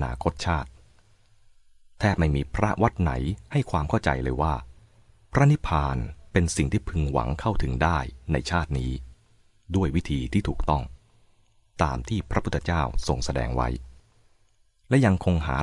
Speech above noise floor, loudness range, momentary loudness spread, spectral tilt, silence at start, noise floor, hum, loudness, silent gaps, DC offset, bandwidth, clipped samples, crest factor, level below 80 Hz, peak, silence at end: 38 dB; 3 LU; 8 LU; -6.5 dB/octave; 0 s; -62 dBFS; none; -26 LUFS; none; under 0.1%; 11.5 kHz; under 0.1%; 20 dB; -36 dBFS; -6 dBFS; 0 s